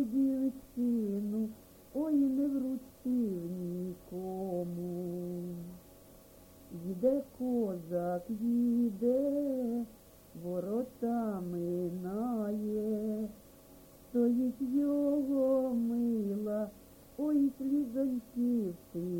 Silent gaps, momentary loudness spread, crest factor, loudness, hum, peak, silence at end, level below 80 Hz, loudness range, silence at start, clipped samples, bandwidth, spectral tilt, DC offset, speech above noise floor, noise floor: none; 11 LU; 16 dB; -34 LUFS; none; -18 dBFS; 0 s; -66 dBFS; 6 LU; 0 s; under 0.1%; 17 kHz; -9 dB/octave; under 0.1%; 25 dB; -57 dBFS